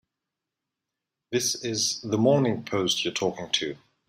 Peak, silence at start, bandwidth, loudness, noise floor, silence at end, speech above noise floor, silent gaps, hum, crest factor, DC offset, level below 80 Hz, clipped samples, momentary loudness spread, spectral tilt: -8 dBFS; 1.3 s; 16 kHz; -26 LUFS; -86 dBFS; 0.3 s; 61 dB; none; none; 20 dB; under 0.1%; -68 dBFS; under 0.1%; 6 LU; -3.5 dB/octave